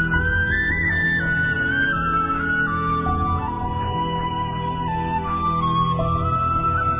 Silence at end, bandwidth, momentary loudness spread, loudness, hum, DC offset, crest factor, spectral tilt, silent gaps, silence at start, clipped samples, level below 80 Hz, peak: 0 s; 3.8 kHz; 6 LU; -21 LUFS; none; under 0.1%; 12 dB; -9.5 dB/octave; none; 0 s; under 0.1%; -32 dBFS; -8 dBFS